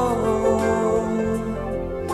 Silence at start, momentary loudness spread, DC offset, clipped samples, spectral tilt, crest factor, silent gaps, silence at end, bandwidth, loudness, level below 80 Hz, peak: 0 s; 7 LU; 0.1%; under 0.1%; -6.5 dB/octave; 14 dB; none; 0 s; 14 kHz; -22 LUFS; -38 dBFS; -8 dBFS